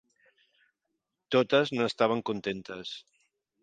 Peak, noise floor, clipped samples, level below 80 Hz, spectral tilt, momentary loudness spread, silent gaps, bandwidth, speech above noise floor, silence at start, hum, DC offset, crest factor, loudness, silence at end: -8 dBFS; -83 dBFS; under 0.1%; -72 dBFS; -5.5 dB/octave; 15 LU; none; 9.2 kHz; 55 dB; 1.3 s; none; under 0.1%; 22 dB; -29 LUFS; 0.6 s